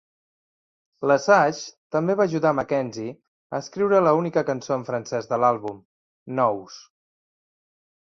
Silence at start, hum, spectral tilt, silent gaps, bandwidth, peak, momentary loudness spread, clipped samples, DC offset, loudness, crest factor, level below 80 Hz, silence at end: 1 s; none; -6 dB/octave; 1.77-1.90 s, 3.28-3.50 s, 5.85-6.26 s; 7.6 kHz; -4 dBFS; 15 LU; under 0.1%; under 0.1%; -23 LUFS; 20 dB; -66 dBFS; 1.2 s